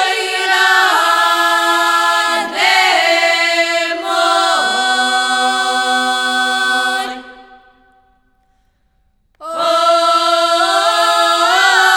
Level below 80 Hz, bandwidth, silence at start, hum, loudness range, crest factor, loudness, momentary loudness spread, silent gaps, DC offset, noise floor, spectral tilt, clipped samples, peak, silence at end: -60 dBFS; 19.5 kHz; 0 s; none; 8 LU; 14 dB; -12 LUFS; 5 LU; none; under 0.1%; -59 dBFS; 1 dB/octave; under 0.1%; 0 dBFS; 0 s